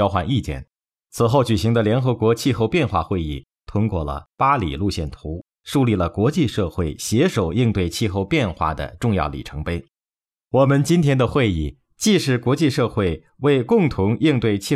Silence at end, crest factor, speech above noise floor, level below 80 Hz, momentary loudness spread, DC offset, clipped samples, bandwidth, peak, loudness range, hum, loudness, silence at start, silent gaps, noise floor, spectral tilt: 0 s; 16 dB; over 71 dB; -38 dBFS; 11 LU; under 0.1%; under 0.1%; 15.5 kHz; -4 dBFS; 3 LU; none; -20 LUFS; 0 s; none; under -90 dBFS; -6 dB/octave